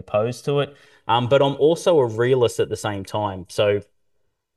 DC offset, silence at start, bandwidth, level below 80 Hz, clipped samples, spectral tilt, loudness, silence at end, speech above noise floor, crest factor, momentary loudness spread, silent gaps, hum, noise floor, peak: under 0.1%; 0.1 s; 12.5 kHz; -60 dBFS; under 0.1%; -5.5 dB/octave; -21 LUFS; 0.75 s; 52 dB; 16 dB; 10 LU; none; none; -72 dBFS; -4 dBFS